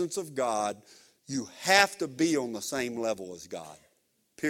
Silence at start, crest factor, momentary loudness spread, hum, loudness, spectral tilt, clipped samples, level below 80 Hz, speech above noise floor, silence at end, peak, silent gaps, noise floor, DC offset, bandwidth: 0 s; 28 dB; 19 LU; none; -29 LUFS; -3 dB/octave; under 0.1%; -72 dBFS; 42 dB; 0 s; -4 dBFS; none; -72 dBFS; under 0.1%; 17 kHz